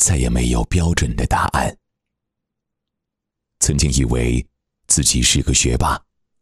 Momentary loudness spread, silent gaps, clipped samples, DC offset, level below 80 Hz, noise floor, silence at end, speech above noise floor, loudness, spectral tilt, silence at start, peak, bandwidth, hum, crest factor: 7 LU; none; under 0.1%; under 0.1%; -26 dBFS; -81 dBFS; 0.45 s; 64 dB; -17 LUFS; -3.5 dB/octave; 0 s; 0 dBFS; 14 kHz; none; 18 dB